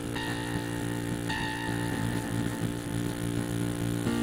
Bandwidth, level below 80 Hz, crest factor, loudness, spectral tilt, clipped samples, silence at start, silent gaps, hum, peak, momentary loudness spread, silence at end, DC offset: 17 kHz; -48 dBFS; 14 dB; -32 LUFS; -5.5 dB/octave; under 0.1%; 0 s; none; none; -16 dBFS; 2 LU; 0 s; under 0.1%